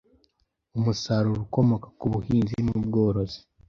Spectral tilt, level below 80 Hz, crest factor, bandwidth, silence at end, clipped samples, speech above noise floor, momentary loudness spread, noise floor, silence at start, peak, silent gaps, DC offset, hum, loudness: -7.5 dB/octave; -48 dBFS; 18 dB; 7.2 kHz; 0.3 s; under 0.1%; 48 dB; 6 LU; -72 dBFS; 0.75 s; -8 dBFS; none; under 0.1%; none; -26 LUFS